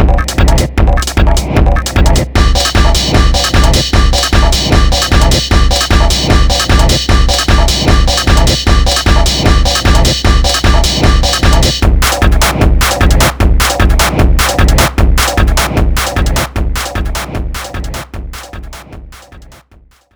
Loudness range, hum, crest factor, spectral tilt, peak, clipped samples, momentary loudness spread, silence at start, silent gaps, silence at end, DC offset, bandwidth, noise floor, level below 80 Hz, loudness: 6 LU; none; 8 dB; -4 dB/octave; 0 dBFS; 0.6%; 8 LU; 0 s; none; 0.7 s; under 0.1%; over 20 kHz; -44 dBFS; -10 dBFS; -10 LUFS